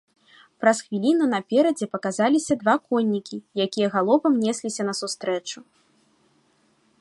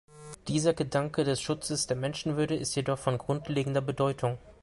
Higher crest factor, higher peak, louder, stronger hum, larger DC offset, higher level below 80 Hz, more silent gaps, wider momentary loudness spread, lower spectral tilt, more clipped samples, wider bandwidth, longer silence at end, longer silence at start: about the same, 20 dB vs 18 dB; first, -4 dBFS vs -12 dBFS; first, -23 LUFS vs -30 LUFS; neither; neither; second, -70 dBFS vs -58 dBFS; neither; first, 8 LU vs 4 LU; about the same, -4.5 dB/octave vs -5 dB/octave; neither; about the same, 11.5 kHz vs 11.5 kHz; first, 1.4 s vs 0.1 s; first, 0.6 s vs 0.1 s